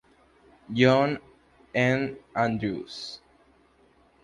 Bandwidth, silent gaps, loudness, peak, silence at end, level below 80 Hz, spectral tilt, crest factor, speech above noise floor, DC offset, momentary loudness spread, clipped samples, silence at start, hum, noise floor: 11 kHz; none; -26 LUFS; -6 dBFS; 1.1 s; -60 dBFS; -6.5 dB/octave; 22 dB; 36 dB; under 0.1%; 17 LU; under 0.1%; 0.7 s; none; -61 dBFS